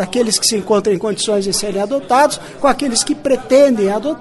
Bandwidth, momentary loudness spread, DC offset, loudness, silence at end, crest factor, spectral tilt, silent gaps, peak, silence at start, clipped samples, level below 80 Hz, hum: 12 kHz; 6 LU; under 0.1%; -15 LUFS; 0 s; 14 dB; -3 dB/octave; none; 0 dBFS; 0 s; under 0.1%; -44 dBFS; none